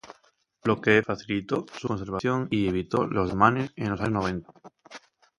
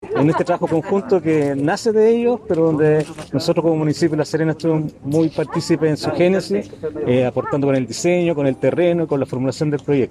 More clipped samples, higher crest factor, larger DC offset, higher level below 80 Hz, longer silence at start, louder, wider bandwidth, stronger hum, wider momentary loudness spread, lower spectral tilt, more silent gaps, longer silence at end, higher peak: neither; first, 24 dB vs 14 dB; neither; about the same, -52 dBFS vs -54 dBFS; about the same, 0.05 s vs 0 s; second, -26 LUFS vs -18 LUFS; about the same, 11.5 kHz vs 12.5 kHz; neither; first, 10 LU vs 6 LU; about the same, -7 dB/octave vs -6.5 dB/octave; neither; first, 0.4 s vs 0 s; about the same, -4 dBFS vs -4 dBFS